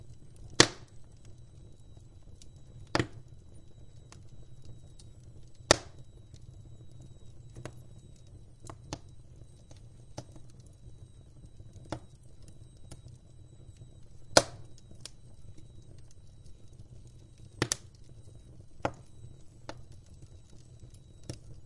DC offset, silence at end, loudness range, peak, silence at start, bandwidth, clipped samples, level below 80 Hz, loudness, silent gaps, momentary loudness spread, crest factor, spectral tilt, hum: under 0.1%; 0 s; 16 LU; 0 dBFS; 0 s; 12 kHz; under 0.1%; -56 dBFS; -30 LUFS; none; 28 LU; 38 dB; -2.5 dB/octave; none